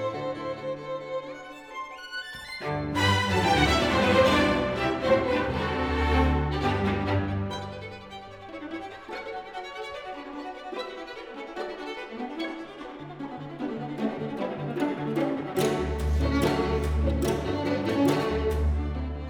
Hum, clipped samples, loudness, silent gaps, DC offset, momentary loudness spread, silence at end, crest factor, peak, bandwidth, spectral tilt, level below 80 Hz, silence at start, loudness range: none; under 0.1%; -28 LUFS; none; under 0.1%; 16 LU; 0 s; 18 dB; -8 dBFS; 17.5 kHz; -6 dB/octave; -36 dBFS; 0 s; 13 LU